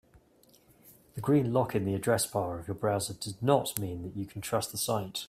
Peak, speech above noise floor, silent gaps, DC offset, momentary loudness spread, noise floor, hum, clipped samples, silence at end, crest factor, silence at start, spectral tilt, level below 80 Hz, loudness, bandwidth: -10 dBFS; 32 dB; none; under 0.1%; 10 LU; -63 dBFS; none; under 0.1%; 0.05 s; 22 dB; 0.85 s; -5 dB/octave; -62 dBFS; -31 LUFS; 16 kHz